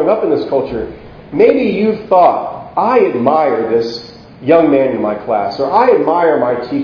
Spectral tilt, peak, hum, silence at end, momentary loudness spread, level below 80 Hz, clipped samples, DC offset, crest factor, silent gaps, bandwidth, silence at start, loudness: -7.5 dB/octave; 0 dBFS; none; 0 s; 11 LU; -46 dBFS; 0.1%; under 0.1%; 12 dB; none; 5.4 kHz; 0 s; -13 LUFS